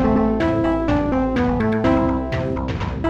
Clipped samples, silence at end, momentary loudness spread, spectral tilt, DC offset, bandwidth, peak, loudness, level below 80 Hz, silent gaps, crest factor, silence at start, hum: under 0.1%; 0 s; 6 LU; -8.5 dB/octave; 0.4%; 7.8 kHz; -6 dBFS; -20 LUFS; -30 dBFS; none; 12 dB; 0 s; none